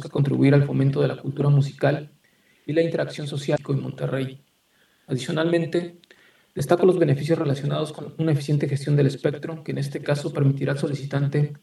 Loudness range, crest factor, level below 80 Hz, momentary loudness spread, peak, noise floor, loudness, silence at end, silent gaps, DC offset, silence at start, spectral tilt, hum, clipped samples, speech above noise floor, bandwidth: 5 LU; 20 dB; -66 dBFS; 11 LU; -2 dBFS; -63 dBFS; -23 LUFS; 0.05 s; none; under 0.1%; 0 s; -7.5 dB/octave; none; under 0.1%; 41 dB; 12 kHz